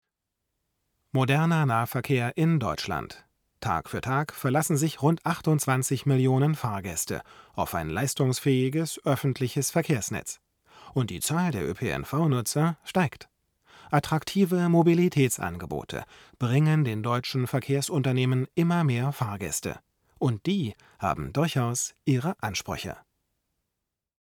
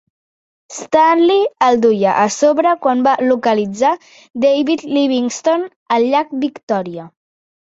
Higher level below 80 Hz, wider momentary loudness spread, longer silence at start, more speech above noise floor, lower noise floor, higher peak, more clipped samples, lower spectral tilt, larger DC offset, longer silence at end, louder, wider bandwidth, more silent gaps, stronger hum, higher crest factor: first, -56 dBFS vs -62 dBFS; about the same, 10 LU vs 9 LU; first, 1.15 s vs 0.7 s; second, 59 dB vs over 76 dB; second, -85 dBFS vs under -90 dBFS; second, -8 dBFS vs 0 dBFS; neither; about the same, -5.5 dB/octave vs -4.5 dB/octave; neither; first, 1.25 s vs 0.7 s; second, -27 LUFS vs -15 LUFS; first, 18.5 kHz vs 8 kHz; second, none vs 4.30-4.34 s, 5.76-5.86 s, 6.63-6.68 s; neither; about the same, 18 dB vs 14 dB